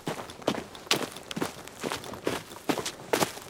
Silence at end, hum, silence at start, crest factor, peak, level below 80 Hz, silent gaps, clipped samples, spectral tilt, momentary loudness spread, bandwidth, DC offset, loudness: 0 s; none; 0 s; 30 dB; -2 dBFS; -64 dBFS; none; under 0.1%; -3 dB/octave; 8 LU; 18 kHz; under 0.1%; -32 LUFS